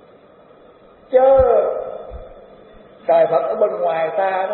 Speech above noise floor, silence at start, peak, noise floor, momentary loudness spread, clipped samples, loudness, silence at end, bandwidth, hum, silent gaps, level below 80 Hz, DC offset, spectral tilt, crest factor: 30 dB; 1.1 s; -2 dBFS; -47 dBFS; 19 LU; under 0.1%; -17 LUFS; 0 s; 4.2 kHz; none; none; -42 dBFS; under 0.1%; -4.5 dB/octave; 16 dB